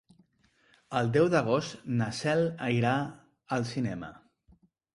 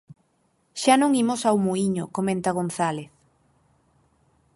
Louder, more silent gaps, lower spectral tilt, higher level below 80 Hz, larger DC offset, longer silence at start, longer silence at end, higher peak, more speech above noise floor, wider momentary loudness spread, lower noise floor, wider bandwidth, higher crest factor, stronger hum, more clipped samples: second, -29 LUFS vs -23 LUFS; neither; first, -6.5 dB/octave vs -5 dB/octave; about the same, -62 dBFS vs -64 dBFS; neither; first, 0.9 s vs 0.75 s; second, 0.8 s vs 1.5 s; second, -12 dBFS vs -4 dBFS; second, 39 dB vs 45 dB; about the same, 10 LU vs 8 LU; about the same, -68 dBFS vs -68 dBFS; about the same, 11.5 kHz vs 11.5 kHz; about the same, 20 dB vs 20 dB; neither; neither